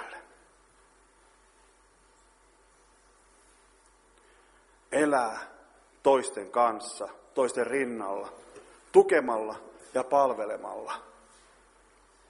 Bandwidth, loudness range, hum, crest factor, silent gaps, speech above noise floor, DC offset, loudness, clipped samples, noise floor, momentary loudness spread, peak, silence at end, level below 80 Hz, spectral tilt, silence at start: 11.5 kHz; 6 LU; none; 24 dB; none; 35 dB; under 0.1%; -28 LUFS; under 0.1%; -62 dBFS; 18 LU; -6 dBFS; 1.25 s; -70 dBFS; -4 dB/octave; 0 s